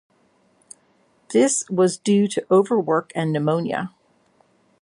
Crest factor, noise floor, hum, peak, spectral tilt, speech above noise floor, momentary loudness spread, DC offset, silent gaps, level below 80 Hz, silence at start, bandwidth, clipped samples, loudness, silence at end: 18 dB; -61 dBFS; none; -4 dBFS; -5 dB/octave; 42 dB; 7 LU; under 0.1%; none; -70 dBFS; 1.3 s; 11.5 kHz; under 0.1%; -20 LUFS; 0.95 s